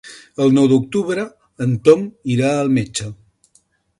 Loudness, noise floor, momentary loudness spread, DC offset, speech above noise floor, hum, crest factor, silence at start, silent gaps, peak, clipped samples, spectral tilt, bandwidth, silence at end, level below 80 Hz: -17 LUFS; -59 dBFS; 13 LU; under 0.1%; 43 dB; none; 18 dB; 0.05 s; none; 0 dBFS; under 0.1%; -6.5 dB/octave; 11.5 kHz; 0.85 s; -54 dBFS